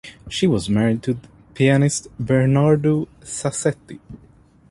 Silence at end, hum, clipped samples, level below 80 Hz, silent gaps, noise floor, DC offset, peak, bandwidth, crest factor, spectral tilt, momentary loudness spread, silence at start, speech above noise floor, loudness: 0.55 s; none; under 0.1%; -48 dBFS; none; -51 dBFS; under 0.1%; -2 dBFS; 11.5 kHz; 18 dB; -6 dB/octave; 13 LU; 0.05 s; 32 dB; -20 LUFS